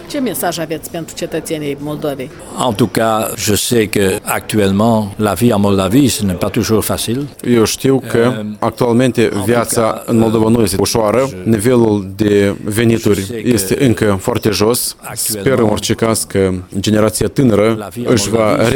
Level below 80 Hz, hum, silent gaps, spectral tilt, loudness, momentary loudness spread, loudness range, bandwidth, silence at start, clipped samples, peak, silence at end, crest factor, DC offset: -40 dBFS; none; none; -5 dB/octave; -14 LUFS; 8 LU; 3 LU; 19.5 kHz; 0 s; under 0.1%; 0 dBFS; 0 s; 14 dB; under 0.1%